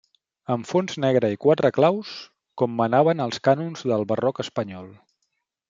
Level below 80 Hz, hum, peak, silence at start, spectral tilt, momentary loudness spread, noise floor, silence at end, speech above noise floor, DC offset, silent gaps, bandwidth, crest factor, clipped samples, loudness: -68 dBFS; none; -4 dBFS; 0.5 s; -6.5 dB/octave; 16 LU; -77 dBFS; 0.75 s; 55 dB; under 0.1%; none; 7.6 kHz; 18 dB; under 0.1%; -22 LUFS